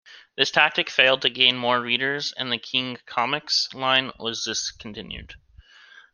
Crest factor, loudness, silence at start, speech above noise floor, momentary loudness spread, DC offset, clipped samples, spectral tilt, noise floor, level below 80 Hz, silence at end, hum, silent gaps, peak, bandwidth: 24 dB; -21 LUFS; 0.1 s; 27 dB; 17 LU; under 0.1%; under 0.1%; -2 dB/octave; -51 dBFS; -56 dBFS; 0.15 s; none; none; -2 dBFS; 12 kHz